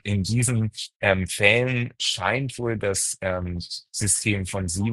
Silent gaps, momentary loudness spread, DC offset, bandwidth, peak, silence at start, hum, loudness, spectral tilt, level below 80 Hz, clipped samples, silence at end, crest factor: 0.96-1.00 s; 10 LU; under 0.1%; 12.5 kHz; -2 dBFS; 0.05 s; none; -23 LUFS; -3.5 dB/octave; -48 dBFS; under 0.1%; 0 s; 22 dB